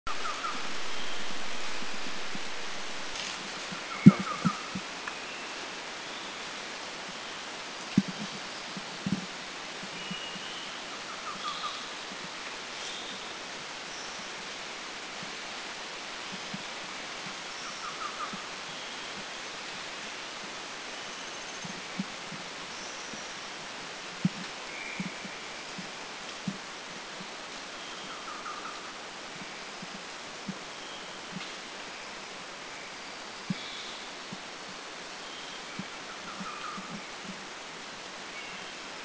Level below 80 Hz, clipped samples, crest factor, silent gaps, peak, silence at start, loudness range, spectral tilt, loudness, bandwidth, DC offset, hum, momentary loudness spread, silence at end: -66 dBFS; under 0.1%; 34 dB; none; 0 dBFS; 0.05 s; 11 LU; -4 dB/octave; -36 LUFS; 8 kHz; under 0.1%; none; 6 LU; 0 s